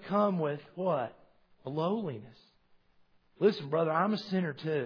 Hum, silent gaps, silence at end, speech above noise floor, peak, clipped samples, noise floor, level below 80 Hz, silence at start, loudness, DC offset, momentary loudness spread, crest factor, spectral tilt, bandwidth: none; none; 0 s; 35 dB; -14 dBFS; under 0.1%; -66 dBFS; -76 dBFS; 0 s; -32 LUFS; under 0.1%; 12 LU; 18 dB; -5.5 dB/octave; 5.4 kHz